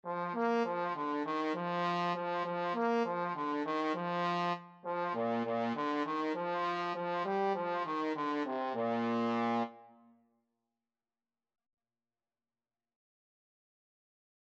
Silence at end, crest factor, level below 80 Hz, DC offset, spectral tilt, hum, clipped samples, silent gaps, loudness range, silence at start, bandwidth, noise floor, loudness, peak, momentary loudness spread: 4.6 s; 16 dB; under -90 dBFS; under 0.1%; -6.5 dB/octave; none; under 0.1%; none; 4 LU; 0.05 s; 8.2 kHz; under -90 dBFS; -35 LUFS; -20 dBFS; 3 LU